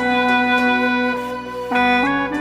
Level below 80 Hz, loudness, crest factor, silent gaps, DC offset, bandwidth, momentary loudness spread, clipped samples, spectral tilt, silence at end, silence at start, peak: -48 dBFS; -17 LUFS; 14 dB; none; under 0.1%; 15 kHz; 9 LU; under 0.1%; -4.5 dB/octave; 0 s; 0 s; -4 dBFS